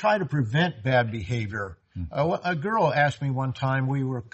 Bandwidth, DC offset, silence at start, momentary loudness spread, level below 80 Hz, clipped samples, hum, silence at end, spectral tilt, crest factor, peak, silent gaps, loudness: 8.2 kHz; under 0.1%; 0 s; 9 LU; -56 dBFS; under 0.1%; none; 0.05 s; -7 dB/octave; 16 dB; -10 dBFS; none; -25 LUFS